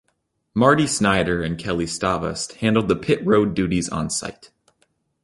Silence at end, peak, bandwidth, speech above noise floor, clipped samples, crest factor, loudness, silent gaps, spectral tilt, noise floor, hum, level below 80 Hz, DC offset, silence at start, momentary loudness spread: 0.9 s; -2 dBFS; 11.5 kHz; 51 dB; under 0.1%; 20 dB; -21 LUFS; none; -5 dB/octave; -71 dBFS; none; -44 dBFS; under 0.1%; 0.55 s; 8 LU